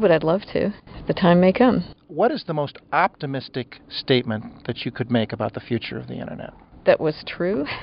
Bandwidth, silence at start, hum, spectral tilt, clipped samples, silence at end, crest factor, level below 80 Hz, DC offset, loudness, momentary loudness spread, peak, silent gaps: 5.6 kHz; 0 s; none; -5 dB/octave; under 0.1%; 0 s; 18 dB; -50 dBFS; under 0.1%; -22 LUFS; 15 LU; -4 dBFS; none